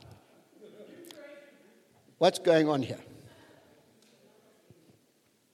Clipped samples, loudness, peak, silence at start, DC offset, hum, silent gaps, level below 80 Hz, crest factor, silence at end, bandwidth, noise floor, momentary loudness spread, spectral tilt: under 0.1%; -27 LUFS; -8 dBFS; 0.8 s; under 0.1%; none; none; -78 dBFS; 26 dB; 2.5 s; 14.5 kHz; -69 dBFS; 28 LU; -5 dB/octave